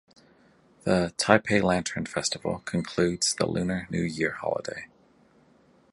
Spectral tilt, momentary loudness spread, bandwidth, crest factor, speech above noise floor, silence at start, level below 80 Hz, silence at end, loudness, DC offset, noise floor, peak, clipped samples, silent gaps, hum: -4 dB/octave; 10 LU; 11.5 kHz; 28 dB; 34 dB; 0.85 s; -54 dBFS; 1.1 s; -27 LUFS; under 0.1%; -60 dBFS; 0 dBFS; under 0.1%; none; none